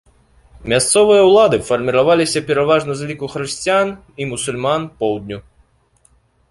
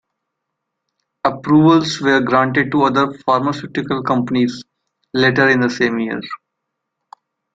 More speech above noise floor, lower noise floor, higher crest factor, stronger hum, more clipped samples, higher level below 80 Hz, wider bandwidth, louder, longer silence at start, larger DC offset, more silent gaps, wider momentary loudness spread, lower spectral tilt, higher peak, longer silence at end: second, 41 dB vs 62 dB; second, -56 dBFS vs -77 dBFS; about the same, 16 dB vs 16 dB; neither; neither; first, -48 dBFS vs -56 dBFS; first, 11.5 kHz vs 7.8 kHz; about the same, -15 LUFS vs -16 LUFS; second, 0.6 s vs 1.25 s; neither; neither; first, 15 LU vs 11 LU; second, -4 dB/octave vs -6 dB/octave; about the same, 0 dBFS vs -2 dBFS; about the same, 1.1 s vs 1.2 s